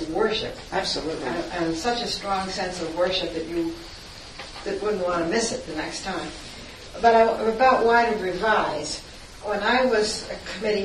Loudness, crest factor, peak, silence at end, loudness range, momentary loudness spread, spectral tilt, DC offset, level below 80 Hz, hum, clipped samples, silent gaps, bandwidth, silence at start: -24 LUFS; 20 dB; -4 dBFS; 0 s; 6 LU; 18 LU; -3.5 dB/octave; under 0.1%; -48 dBFS; none; under 0.1%; none; 12.5 kHz; 0 s